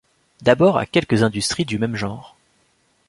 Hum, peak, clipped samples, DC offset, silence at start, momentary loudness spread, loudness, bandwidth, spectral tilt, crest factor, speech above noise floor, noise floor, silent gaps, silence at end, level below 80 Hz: none; -2 dBFS; under 0.1%; under 0.1%; 0.4 s; 12 LU; -19 LUFS; 11.5 kHz; -5 dB/octave; 18 dB; 44 dB; -62 dBFS; none; 0.8 s; -50 dBFS